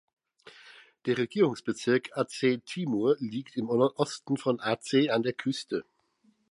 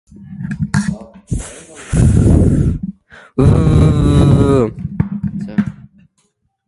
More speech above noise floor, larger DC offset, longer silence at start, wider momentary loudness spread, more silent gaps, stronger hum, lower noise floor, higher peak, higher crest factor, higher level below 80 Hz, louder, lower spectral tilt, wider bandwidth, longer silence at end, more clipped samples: second, 40 dB vs 51 dB; neither; first, 0.45 s vs 0.2 s; second, 8 LU vs 17 LU; neither; neither; first, -68 dBFS vs -63 dBFS; second, -12 dBFS vs 0 dBFS; about the same, 18 dB vs 14 dB; second, -76 dBFS vs -22 dBFS; second, -29 LUFS vs -14 LUFS; second, -5.5 dB/octave vs -8 dB/octave; about the same, 11.5 kHz vs 11.5 kHz; second, 0.7 s vs 0.95 s; neither